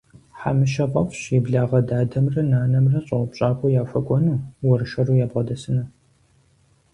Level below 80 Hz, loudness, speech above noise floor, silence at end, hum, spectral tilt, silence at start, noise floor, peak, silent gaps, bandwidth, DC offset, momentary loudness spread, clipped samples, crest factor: -50 dBFS; -21 LUFS; 40 dB; 1.05 s; none; -8.5 dB/octave; 0.35 s; -59 dBFS; -6 dBFS; none; 9.4 kHz; under 0.1%; 6 LU; under 0.1%; 16 dB